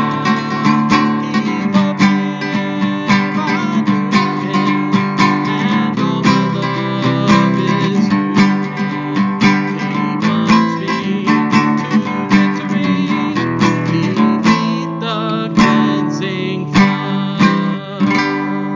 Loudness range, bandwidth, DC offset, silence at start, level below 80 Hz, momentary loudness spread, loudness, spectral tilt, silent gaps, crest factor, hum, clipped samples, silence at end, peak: 1 LU; 7.6 kHz; under 0.1%; 0 s; -48 dBFS; 6 LU; -15 LUFS; -6.5 dB/octave; none; 14 dB; none; under 0.1%; 0 s; 0 dBFS